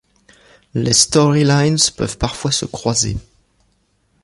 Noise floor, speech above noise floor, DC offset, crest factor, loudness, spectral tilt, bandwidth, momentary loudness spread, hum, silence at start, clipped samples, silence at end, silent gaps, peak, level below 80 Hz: -62 dBFS; 46 dB; under 0.1%; 18 dB; -15 LUFS; -4 dB/octave; 11.5 kHz; 9 LU; none; 0.75 s; under 0.1%; 1.05 s; none; 0 dBFS; -38 dBFS